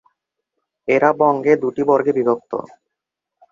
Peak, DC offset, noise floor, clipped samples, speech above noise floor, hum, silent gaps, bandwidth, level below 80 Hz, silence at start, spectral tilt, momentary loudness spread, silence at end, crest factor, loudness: -2 dBFS; under 0.1%; -82 dBFS; under 0.1%; 66 dB; none; none; 7.4 kHz; -64 dBFS; 0.85 s; -8 dB/octave; 13 LU; 0.9 s; 18 dB; -17 LUFS